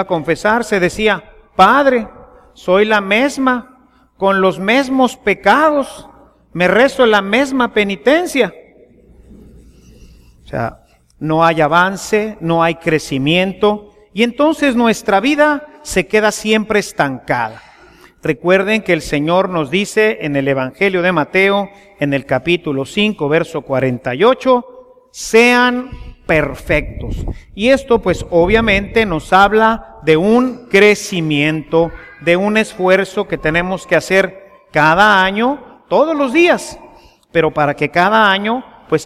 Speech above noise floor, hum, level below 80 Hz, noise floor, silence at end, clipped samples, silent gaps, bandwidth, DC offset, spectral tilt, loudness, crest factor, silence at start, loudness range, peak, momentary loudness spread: 32 dB; none; -38 dBFS; -45 dBFS; 0 s; under 0.1%; none; 15.5 kHz; under 0.1%; -5 dB/octave; -14 LUFS; 14 dB; 0 s; 3 LU; 0 dBFS; 10 LU